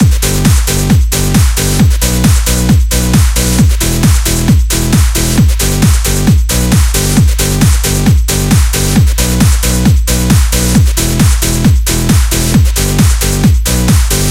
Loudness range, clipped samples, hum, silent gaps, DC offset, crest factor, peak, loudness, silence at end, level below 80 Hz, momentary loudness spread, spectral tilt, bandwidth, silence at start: 0 LU; 0.2%; none; none; under 0.1%; 8 dB; 0 dBFS; -10 LUFS; 0 s; -12 dBFS; 1 LU; -4.5 dB/octave; 17 kHz; 0 s